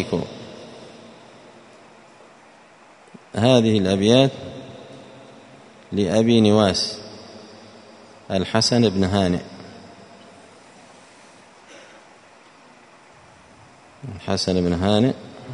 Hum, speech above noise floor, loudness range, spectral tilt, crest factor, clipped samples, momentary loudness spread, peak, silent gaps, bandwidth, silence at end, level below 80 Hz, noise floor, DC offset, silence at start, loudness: none; 31 dB; 10 LU; -5.5 dB/octave; 22 dB; under 0.1%; 25 LU; 0 dBFS; none; 11 kHz; 0 s; -54 dBFS; -49 dBFS; under 0.1%; 0 s; -19 LUFS